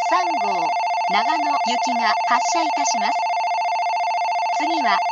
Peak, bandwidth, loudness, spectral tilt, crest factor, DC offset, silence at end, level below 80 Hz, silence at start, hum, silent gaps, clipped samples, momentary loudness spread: -4 dBFS; 8.4 kHz; -20 LUFS; -1.5 dB/octave; 16 dB; under 0.1%; 0 s; -84 dBFS; 0 s; none; none; under 0.1%; 3 LU